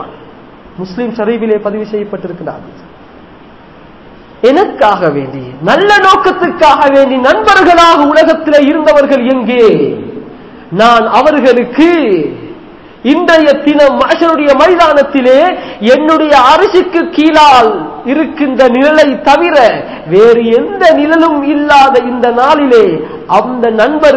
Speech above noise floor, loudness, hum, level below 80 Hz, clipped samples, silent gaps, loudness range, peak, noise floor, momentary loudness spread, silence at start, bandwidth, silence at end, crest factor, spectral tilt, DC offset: 28 dB; -7 LUFS; none; -42 dBFS; 7%; none; 8 LU; 0 dBFS; -34 dBFS; 13 LU; 0 s; 8 kHz; 0 s; 8 dB; -5 dB/octave; 0.3%